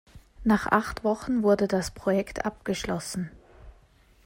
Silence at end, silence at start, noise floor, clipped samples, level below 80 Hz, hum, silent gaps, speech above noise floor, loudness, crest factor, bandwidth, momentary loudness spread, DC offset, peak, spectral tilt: 0.55 s; 0.15 s; -58 dBFS; under 0.1%; -48 dBFS; none; none; 32 dB; -27 LUFS; 20 dB; 16 kHz; 9 LU; under 0.1%; -8 dBFS; -5.5 dB/octave